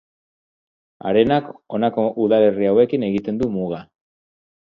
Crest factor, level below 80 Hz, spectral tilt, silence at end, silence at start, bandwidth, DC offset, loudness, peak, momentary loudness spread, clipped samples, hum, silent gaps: 18 dB; -54 dBFS; -9 dB/octave; 0.95 s; 1.05 s; 5.4 kHz; under 0.1%; -19 LUFS; -2 dBFS; 12 LU; under 0.1%; none; none